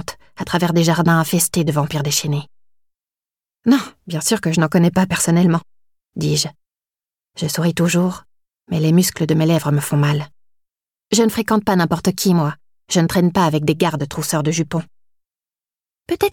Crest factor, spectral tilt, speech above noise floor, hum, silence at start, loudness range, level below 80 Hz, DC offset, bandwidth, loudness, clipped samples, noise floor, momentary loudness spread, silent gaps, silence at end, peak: 16 dB; -5 dB/octave; over 73 dB; none; 0 s; 3 LU; -50 dBFS; under 0.1%; 17.5 kHz; -18 LUFS; under 0.1%; under -90 dBFS; 10 LU; none; 0 s; -4 dBFS